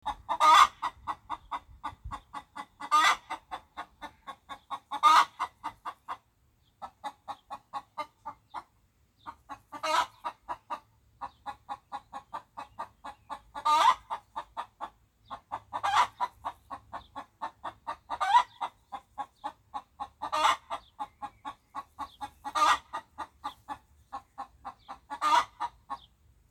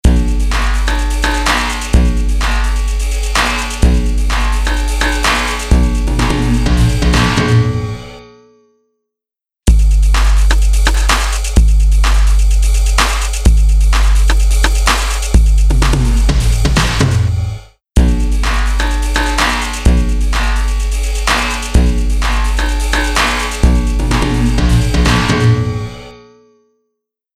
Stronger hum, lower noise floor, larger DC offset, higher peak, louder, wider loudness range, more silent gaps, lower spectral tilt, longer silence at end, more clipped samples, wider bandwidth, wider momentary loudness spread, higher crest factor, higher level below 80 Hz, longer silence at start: second, none vs 60 Hz at -30 dBFS; second, -68 dBFS vs -87 dBFS; neither; second, -6 dBFS vs 0 dBFS; second, -29 LUFS vs -14 LUFS; first, 12 LU vs 2 LU; neither; second, -1 dB/octave vs -4.5 dB/octave; second, 0.55 s vs 1.2 s; neither; first, 16.5 kHz vs 13.5 kHz; first, 22 LU vs 5 LU; first, 26 dB vs 12 dB; second, -62 dBFS vs -12 dBFS; about the same, 0.05 s vs 0.05 s